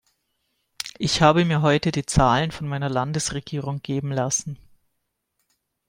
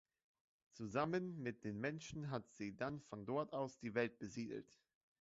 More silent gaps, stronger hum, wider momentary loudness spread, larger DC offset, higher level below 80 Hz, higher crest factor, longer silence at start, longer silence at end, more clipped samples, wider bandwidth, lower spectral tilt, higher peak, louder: neither; neither; first, 12 LU vs 8 LU; neither; first, -42 dBFS vs -76 dBFS; about the same, 22 dB vs 20 dB; about the same, 0.85 s vs 0.75 s; first, 1.35 s vs 0.55 s; neither; first, 16 kHz vs 7.6 kHz; about the same, -4.5 dB/octave vs -5.5 dB/octave; first, -2 dBFS vs -26 dBFS; first, -22 LUFS vs -45 LUFS